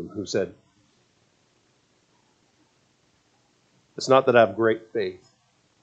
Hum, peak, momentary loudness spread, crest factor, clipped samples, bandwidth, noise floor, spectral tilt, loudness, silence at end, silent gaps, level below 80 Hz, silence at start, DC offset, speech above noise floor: none; -4 dBFS; 16 LU; 24 dB; under 0.1%; 8.6 kHz; -65 dBFS; -5 dB/octave; -22 LUFS; 0.65 s; none; -72 dBFS; 0 s; under 0.1%; 43 dB